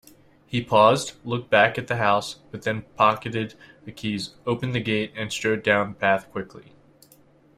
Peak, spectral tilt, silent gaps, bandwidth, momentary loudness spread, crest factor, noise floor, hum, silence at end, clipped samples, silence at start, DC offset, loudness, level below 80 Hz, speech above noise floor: -2 dBFS; -5 dB/octave; none; 15 kHz; 15 LU; 22 dB; -56 dBFS; none; 0.95 s; under 0.1%; 0.5 s; under 0.1%; -23 LUFS; -60 dBFS; 32 dB